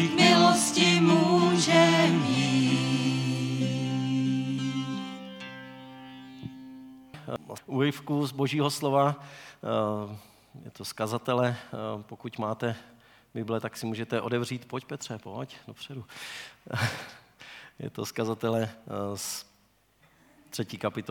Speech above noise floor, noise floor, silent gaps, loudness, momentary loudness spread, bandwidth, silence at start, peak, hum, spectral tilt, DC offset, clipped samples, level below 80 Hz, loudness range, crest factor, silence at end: 34 dB; -66 dBFS; none; -27 LUFS; 22 LU; 18 kHz; 0 s; -8 dBFS; none; -4.5 dB/octave; under 0.1%; under 0.1%; -72 dBFS; 13 LU; 20 dB; 0 s